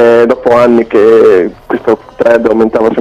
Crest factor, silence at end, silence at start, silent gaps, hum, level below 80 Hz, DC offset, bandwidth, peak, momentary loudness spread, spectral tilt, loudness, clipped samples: 6 dB; 0 s; 0 s; none; none; -42 dBFS; under 0.1%; 8.8 kHz; 0 dBFS; 8 LU; -7 dB/octave; -8 LUFS; 3%